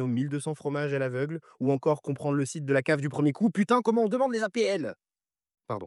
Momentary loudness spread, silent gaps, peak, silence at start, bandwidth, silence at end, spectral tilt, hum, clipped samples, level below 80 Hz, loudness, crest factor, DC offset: 8 LU; none; -12 dBFS; 0 s; 12 kHz; 0 s; -6.5 dB/octave; none; under 0.1%; -82 dBFS; -28 LUFS; 16 dB; under 0.1%